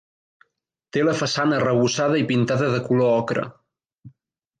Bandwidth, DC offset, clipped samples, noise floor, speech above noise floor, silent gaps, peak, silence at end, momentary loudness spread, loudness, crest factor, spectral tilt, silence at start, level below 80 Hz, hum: 9.4 kHz; under 0.1%; under 0.1%; -75 dBFS; 55 dB; 3.99-4.03 s; -8 dBFS; 0.5 s; 7 LU; -21 LUFS; 14 dB; -5.5 dB/octave; 0.95 s; -62 dBFS; none